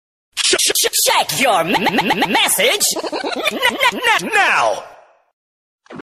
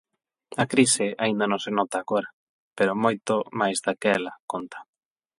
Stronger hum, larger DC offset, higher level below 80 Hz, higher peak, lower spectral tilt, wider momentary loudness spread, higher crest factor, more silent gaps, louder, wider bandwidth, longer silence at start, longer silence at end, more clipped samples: neither; neither; first, -56 dBFS vs -70 dBFS; about the same, -2 dBFS vs -4 dBFS; second, -1 dB/octave vs -3.5 dB/octave; second, 7 LU vs 13 LU; second, 16 dB vs 22 dB; about the same, 5.33-5.79 s vs 2.33-2.71 s, 4.40-4.48 s; first, -14 LUFS vs -25 LUFS; first, 14.5 kHz vs 11.5 kHz; second, 0.35 s vs 0.5 s; second, 0 s vs 0.6 s; neither